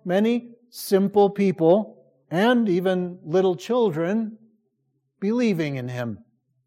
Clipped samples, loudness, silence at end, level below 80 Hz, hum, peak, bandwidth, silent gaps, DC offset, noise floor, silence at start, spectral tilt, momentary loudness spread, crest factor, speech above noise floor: under 0.1%; -22 LUFS; 0.5 s; -72 dBFS; none; -6 dBFS; 16 kHz; none; under 0.1%; -73 dBFS; 0.05 s; -6.5 dB/octave; 13 LU; 16 dB; 51 dB